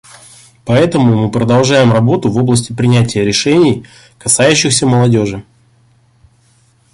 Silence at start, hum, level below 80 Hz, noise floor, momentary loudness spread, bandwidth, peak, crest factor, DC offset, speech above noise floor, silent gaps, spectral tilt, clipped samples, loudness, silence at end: 0.65 s; none; -42 dBFS; -51 dBFS; 6 LU; 11.5 kHz; 0 dBFS; 12 dB; under 0.1%; 41 dB; none; -5 dB/octave; under 0.1%; -11 LUFS; 1.5 s